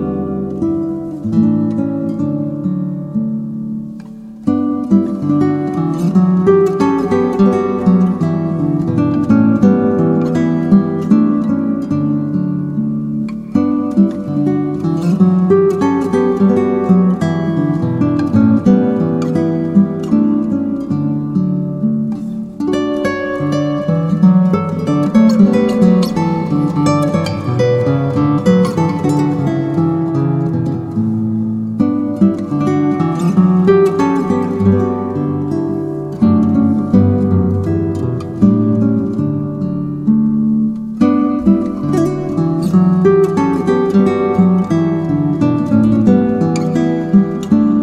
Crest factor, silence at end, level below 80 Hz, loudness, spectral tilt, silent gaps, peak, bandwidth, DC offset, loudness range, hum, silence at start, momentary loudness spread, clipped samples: 14 dB; 0 s; -46 dBFS; -14 LUFS; -9 dB/octave; none; 0 dBFS; 9.8 kHz; under 0.1%; 4 LU; none; 0 s; 7 LU; under 0.1%